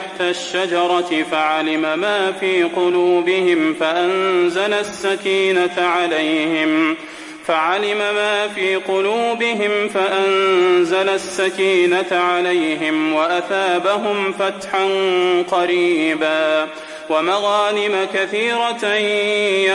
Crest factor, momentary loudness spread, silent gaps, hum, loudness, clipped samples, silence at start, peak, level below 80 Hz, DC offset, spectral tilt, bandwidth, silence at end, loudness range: 12 dB; 4 LU; none; none; -17 LUFS; under 0.1%; 0 s; -4 dBFS; -64 dBFS; under 0.1%; -3.5 dB/octave; 11.5 kHz; 0 s; 2 LU